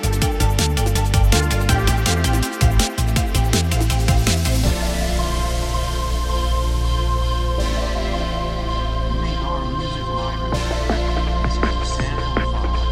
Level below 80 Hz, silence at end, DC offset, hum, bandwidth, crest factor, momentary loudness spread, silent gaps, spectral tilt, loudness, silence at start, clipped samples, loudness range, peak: -20 dBFS; 0 s; under 0.1%; none; 16.5 kHz; 16 dB; 6 LU; none; -4.5 dB/octave; -20 LUFS; 0 s; under 0.1%; 5 LU; -2 dBFS